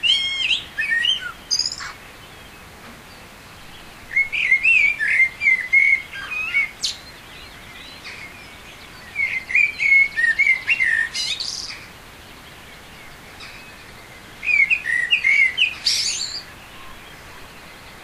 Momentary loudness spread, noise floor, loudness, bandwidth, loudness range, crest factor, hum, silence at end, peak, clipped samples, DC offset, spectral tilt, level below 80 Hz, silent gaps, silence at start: 26 LU; -42 dBFS; -17 LUFS; 16 kHz; 9 LU; 16 dB; none; 0 s; -6 dBFS; under 0.1%; under 0.1%; 0.5 dB/octave; -52 dBFS; none; 0 s